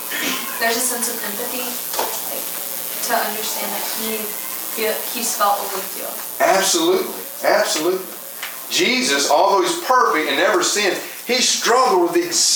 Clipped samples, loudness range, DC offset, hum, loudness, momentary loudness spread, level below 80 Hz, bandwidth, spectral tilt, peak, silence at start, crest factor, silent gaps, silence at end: under 0.1%; 5 LU; under 0.1%; none; -18 LUFS; 9 LU; -68 dBFS; over 20 kHz; -1 dB/octave; -2 dBFS; 0 s; 18 dB; none; 0 s